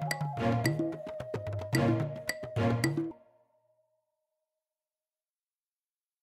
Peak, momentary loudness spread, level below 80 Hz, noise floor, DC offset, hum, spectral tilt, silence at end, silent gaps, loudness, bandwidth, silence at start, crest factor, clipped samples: -12 dBFS; 10 LU; -62 dBFS; under -90 dBFS; under 0.1%; none; -6 dB/octave; 3.05 s; none; -32 LUFS; 16 kHz; 0 s; 22 dB; under 0.1%